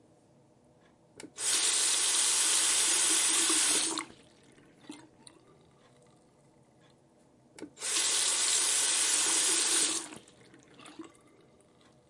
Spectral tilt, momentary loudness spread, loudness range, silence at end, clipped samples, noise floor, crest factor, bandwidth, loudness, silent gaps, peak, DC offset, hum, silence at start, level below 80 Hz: 2 dB/octave; 10 LU; 9 LU; 1.05 s; under 0.1%; -63 dBFS; 18 dB; 11.5 kHz; -25 LUFS; none; -14 dBFS; under 0.1%; none; 1.15 s; -82 dBFS